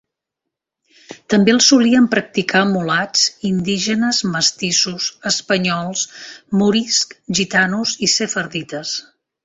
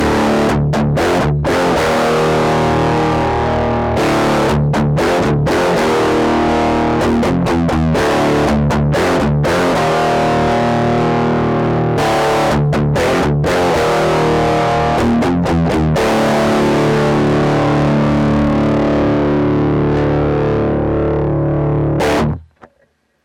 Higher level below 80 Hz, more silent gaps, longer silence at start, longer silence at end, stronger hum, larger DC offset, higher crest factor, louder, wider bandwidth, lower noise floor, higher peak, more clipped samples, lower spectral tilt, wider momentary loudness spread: second, -58 dBFS vs -30 dBFS; neither; first, 1.1 s vs 0 s; second, 0.45 s vs 0.8 s; neither; neither; first, 18 dB vs 8 dB; about the same, -16 LUFS vs -14 LUFS; second, 8 kHz vs 16 kHz; first, -82 dBFS vs -58 dBFS; first, 0 dBFS vs -6 dBFS; neither; second, -3 dB/octave vs -6.5 dB/octave; first, 11 LU vs 2 LU